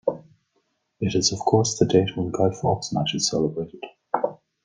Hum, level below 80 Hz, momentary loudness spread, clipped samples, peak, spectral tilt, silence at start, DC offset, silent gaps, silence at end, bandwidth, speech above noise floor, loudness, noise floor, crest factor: none; -56 dBFS; 11 LU; under 0.1%; -4 dBFS; -4.5 dB/octave; 0.05 s; under 0.1%; none; 0.3 s; 10 kHz; 49 dB; -23 LUFS; -71 dBFS; 20 dB